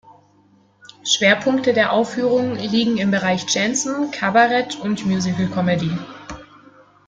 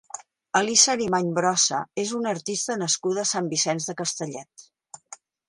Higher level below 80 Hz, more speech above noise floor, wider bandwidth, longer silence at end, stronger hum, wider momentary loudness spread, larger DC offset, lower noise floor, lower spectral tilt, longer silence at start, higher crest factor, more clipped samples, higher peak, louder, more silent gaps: first, -54 dBFS vs -68 dBFS; first, 37 dB vs 24 dB; second, 9.4 kHz vs 11.5 kHz; first, 0.65 s vs 0.35 s; first, 50 Hz at -40 dBFS vs none; second, 12 LU vs 19 LU; neither; first, -55 dBFS vs -49 dBFS; first, -4 dB/octave vs -2 dB/octave; about the same, 0.1 s vs 0.15 s; second, 18 dB vs 24 dB; neither; about the same, -2 dBFS vs -2 dBFS; first, -18 LUFS vs -23 LUFS; neither